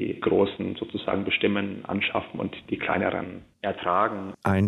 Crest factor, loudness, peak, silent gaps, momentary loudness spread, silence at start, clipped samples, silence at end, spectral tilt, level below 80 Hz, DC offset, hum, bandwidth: 16 dB; -27 LUFS; -10 dBFS; none; 9 LU; 0 s; under 0.1%; 0 s; -7.5 dB/octave; -58 dBFS; under 0.1%; none; 12 kHz